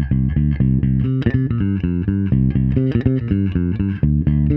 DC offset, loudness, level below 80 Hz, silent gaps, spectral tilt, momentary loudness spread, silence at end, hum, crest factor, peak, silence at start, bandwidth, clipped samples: under 0.1%; -18 LUFS; -26 dBFS; none; -12 dB/octave; 3 LU; 0 s; none; 16 dB; -2 dBFS; 0 s; 4.1 kHz; under 0.1%